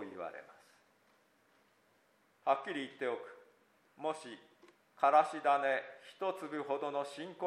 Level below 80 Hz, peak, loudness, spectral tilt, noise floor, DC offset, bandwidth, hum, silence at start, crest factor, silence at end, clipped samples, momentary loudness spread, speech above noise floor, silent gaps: under -90 dBFS; -16 dBFS; -36 LUFS; -4 dB/octave; -72 dBFS; under 0.1%; 12 kHz; none; 0 s; 22 dB; 0 s; under 0.1%; 19 LU; 36 dB; none